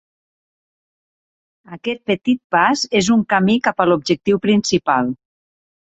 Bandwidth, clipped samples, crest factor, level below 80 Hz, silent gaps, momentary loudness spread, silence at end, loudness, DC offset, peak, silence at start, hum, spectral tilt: 8.2 kHz; under 0.1%; 18 dB; -56 dBFS; 2.44-2.50 s; 9 LU; 0.8 s; -17 LUFS; under 0.1%; -2 dBFS; 1.7 s; none; -4.5 dB/octave